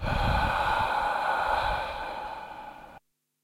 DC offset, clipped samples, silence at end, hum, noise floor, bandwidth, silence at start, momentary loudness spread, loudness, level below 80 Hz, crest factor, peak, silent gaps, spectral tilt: under 0.1%; under 0.1%; 0.45 s; none; -57 dBFS; 16.5 kHz; 0 s; 16 LU; -28 LUFS; -38 dBFS; 16 dB; -14 dBFS; none; -5 dB/octave